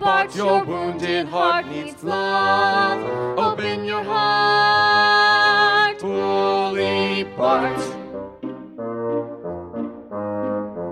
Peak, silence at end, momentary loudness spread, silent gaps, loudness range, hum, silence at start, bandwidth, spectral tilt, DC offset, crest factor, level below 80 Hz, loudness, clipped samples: -4 dBFS; 0 s; 16 LU; none; 9 LU; none; 0 s; 12.5 kHz; -4.5 dB/octave; under 0.1%; 16 dB; -60 dBFS; -19 LUFS; under 0.1%